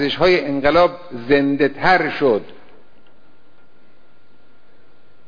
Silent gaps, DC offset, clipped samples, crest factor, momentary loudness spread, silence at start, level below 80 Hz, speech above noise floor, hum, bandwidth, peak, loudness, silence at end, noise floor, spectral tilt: none; 2%; under 0.1%; 16 dB; 4 LU; 0 s; -46 dBFS; 39 dB; none; 5.2 kHz; -4 dBFS; -16 LUFS; 2.75 s; -56 dBFS; -6.5 dB/octave